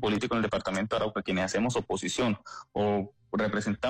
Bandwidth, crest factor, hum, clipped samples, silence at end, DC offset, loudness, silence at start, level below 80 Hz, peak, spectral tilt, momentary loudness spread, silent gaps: 11 kHz; 10 dB; none; under 0.1%; 0 s; under 0.1%; -30 LUFS; 0 s; -56 dBFS; -18 dBFS; -5 dB/octave; 4 LU; none